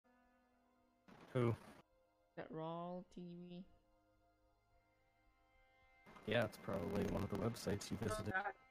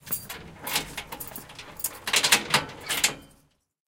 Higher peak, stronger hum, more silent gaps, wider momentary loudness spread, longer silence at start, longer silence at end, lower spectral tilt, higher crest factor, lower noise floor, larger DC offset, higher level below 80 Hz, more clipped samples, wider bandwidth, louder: second, -24 dBFS vs -2 dBFS; neither; neither; second, 17 LU vs 20 LU; first, 1.1 s vs 0.05 s; second, 0.15 s vs 0.6 s; first, -6 dB/octave vs -0.5 dB/octave; second, 22 dB vs 28 dB; first, -78 dBFS vs -63 dBFS; neither; second, -66 dBFS vs -56 dBFS; neither; about the same, 15.5 kHz vs 17 kHz; second, -44 LUFS vs -25 LUFS